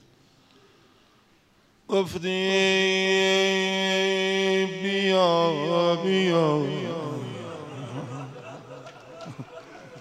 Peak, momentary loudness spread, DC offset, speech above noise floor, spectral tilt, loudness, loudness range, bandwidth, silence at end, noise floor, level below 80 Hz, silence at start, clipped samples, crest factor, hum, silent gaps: -8 dBFS; 21 LU; under 0.1%; 38 dB; -4.5 dB/octave; -23 LUFS; 8 LU; 12.5 kHz; 0 s; -61 dBFS; -68 dBFS; 1.9 s; under 0.1%; 18 dB; none; none